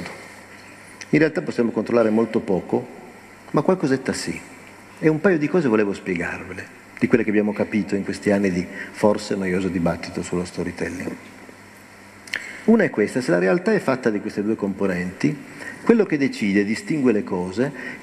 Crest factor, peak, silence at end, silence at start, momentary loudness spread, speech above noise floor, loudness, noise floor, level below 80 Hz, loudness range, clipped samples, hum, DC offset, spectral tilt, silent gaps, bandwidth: 22 dB; 0 dBFS; 0 s; 0 s; 19 LU; 24 dB; -22 LUFS; -44 dBFS; -56 dBFS; 3 LU; under 0.1%; none; under 0.1%; -6.5 dB/octave; none; 13 kHz